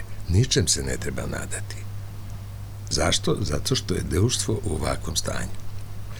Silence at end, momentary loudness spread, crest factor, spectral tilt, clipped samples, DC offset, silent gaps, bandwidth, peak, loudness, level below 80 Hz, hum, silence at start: 0 s; 16 LU; 18 dB; -4 dB/octave; under 0.1%; under 0.1%; none; over 20 kHz; -6 dBFS; -25 LUFS; -36 dBFS; none; 0 s